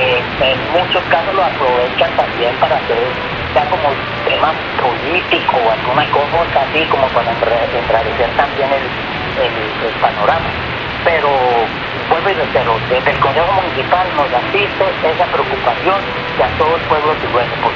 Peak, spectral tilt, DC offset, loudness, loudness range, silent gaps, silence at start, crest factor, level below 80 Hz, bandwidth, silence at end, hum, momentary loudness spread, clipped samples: 0 dBFS; -2 dB/octave; under 0.1%; -14 LUFS; 2 LU; none; 0 s; 14 dB; -36 dBFS; 7 kHz; 0 s; none; 3 LU; under 0.1%